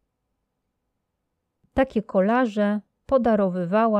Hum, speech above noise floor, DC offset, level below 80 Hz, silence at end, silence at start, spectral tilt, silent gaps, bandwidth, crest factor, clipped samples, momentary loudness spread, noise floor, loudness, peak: none; 57 dB; under 0.1%; -50 dBFS; 0 s; 1.75 s; -8.5 dB/octave; none; 8.6 kHz; 16 dB; under 0.1%; 5 LU; -78 dBFS; -23 LUFS; -8 dBFS